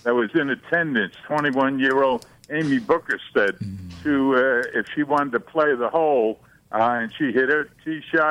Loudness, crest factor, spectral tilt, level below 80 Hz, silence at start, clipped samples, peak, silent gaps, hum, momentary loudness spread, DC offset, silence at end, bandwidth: -22 LUFS; 14 dB; -6.5 dB/octave; -60 dBFS; 0.05 s; under 0.1%; -6 dBFS; none; none; 10 LU; under 0.1%; 0 s; 11 kHz